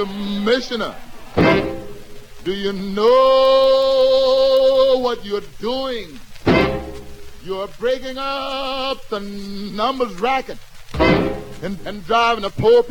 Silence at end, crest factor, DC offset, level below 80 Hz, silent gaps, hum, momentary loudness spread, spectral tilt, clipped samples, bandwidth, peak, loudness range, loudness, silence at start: 0 s; 18 dB; under 0.1%; -38 dBFS; none; none; 16 LU; -5.5 dB/octave; under 0.1%; 17.5 kHz; 0 dBFS; 8 LU; -18 LUFS; 0 s